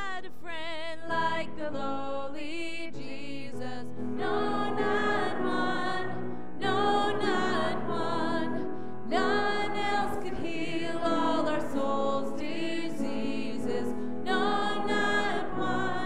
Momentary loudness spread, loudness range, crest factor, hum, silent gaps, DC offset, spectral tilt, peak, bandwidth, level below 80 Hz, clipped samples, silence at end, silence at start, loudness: 11 LU; 6 LU; 16 dB; none; none; 3%; -5 dB/octave; -14 dBFS; 14 kHz; -60 dBFS; under 0.1%; 0 s; 0 s; -31 LUFS